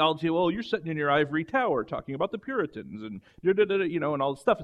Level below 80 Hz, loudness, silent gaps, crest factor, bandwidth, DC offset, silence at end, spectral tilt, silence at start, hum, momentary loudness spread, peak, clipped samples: -62 dBFS; -27 LUFS; none; 18 dB; 11.5 kHz; under 0.1%; 0 s; -7 dB/octave; 0 s; none; 10 LU; -8 dBFS; under 0.1%